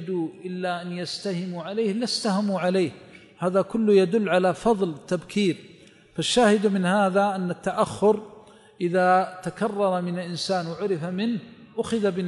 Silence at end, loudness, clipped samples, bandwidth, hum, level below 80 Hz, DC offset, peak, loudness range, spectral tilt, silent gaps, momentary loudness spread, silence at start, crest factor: 0 s; -24 LUFS; under 0.1%; 11.5 kHz; none; -62 dBFS; under 0.1%; -8 dBFS; 4 LU; -5.5 dB/octave; none; 10 LU; 0 s; 16 dB